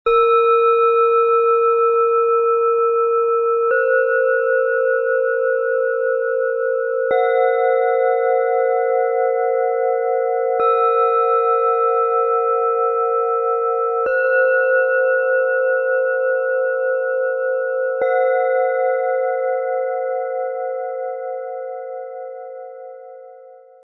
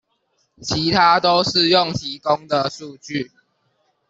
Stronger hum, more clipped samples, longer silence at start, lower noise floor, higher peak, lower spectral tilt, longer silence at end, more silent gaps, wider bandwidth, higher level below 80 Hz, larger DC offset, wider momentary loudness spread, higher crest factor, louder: neither; neither; second, 0.05 s vs 0.6 s; second, -43 dBFS vs -67 dBFS; second, -6 dBFS vs -2 dBFS; about the same, -4.5 dB/octave vs -4 dB/octave; second, 0.3 s vs 0.85 s; neither; second, 4 kHz vs 8 kHz; second, -62 dBFS vs -52 dBFS; neither; second, 10 LU vs 14 LU; second, 12 dB vs 18 dB; about the same, -17 LUFS vs -18 LUFS